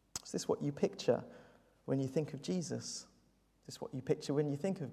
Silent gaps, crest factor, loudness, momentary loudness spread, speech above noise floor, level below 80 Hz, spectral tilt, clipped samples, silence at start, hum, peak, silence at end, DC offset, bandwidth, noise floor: none; 20 dB; -38 LUFS; 12 LU; 34 dB; -72 dBFS; -5.5 dB/octave; under 0.1%; 0.15 s; none; -18 dBFS; 0 s; under 0.1%; 15.5 kHz; -71 dBFS